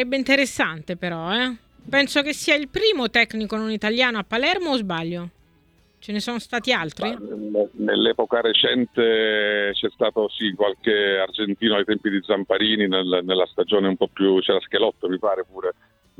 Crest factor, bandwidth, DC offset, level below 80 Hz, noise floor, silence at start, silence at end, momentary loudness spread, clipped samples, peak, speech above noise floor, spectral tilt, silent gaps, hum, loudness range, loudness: 18 dB; 14.5 kHz; under 0.1%; -58 dBFS; -59 dBFS; 0 s; 0.45 s; 9 LU; under 0.1%; -4 dBFS; 37 dB; -4 dB/octave; none; none; 4 LU; -21 LUFS